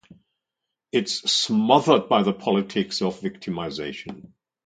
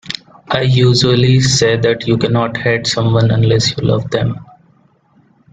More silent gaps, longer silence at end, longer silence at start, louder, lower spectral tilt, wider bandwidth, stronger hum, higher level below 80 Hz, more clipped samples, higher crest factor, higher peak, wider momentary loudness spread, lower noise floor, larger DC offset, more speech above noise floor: neither; second, 0.5 s vs 1.1 s; first, 0.95 s vs 0.05 s; second, -22 LUFS vs -13 LUFS; about the same, -4.5 dB/octave vs -5 dB/octave; about the same, 9.4 kHz vs 9.2 kHz; neither; second, -62 dBFS vs -42 dBFS; neither; first, 22 dB vs 14 dB; about the same, -2 dBFS vs 0 dBFS; first, 14 LU vs 9 LU; first, -84 dBFS vs -52 dBFS; neither; first, 62 dB vs 40 dB